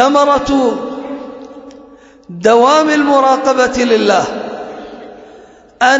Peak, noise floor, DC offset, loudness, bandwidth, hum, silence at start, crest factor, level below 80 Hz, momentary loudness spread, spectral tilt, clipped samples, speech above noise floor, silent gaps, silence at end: 0 dBFS; -40 dBFS; under 0.1%; -12 LUFS; 8 kHz; none; 0 s; 14 dB; -44 dBFS; 21 LU; -3.5 dB/octave; under 0.1%; 29 dB; none; 0 s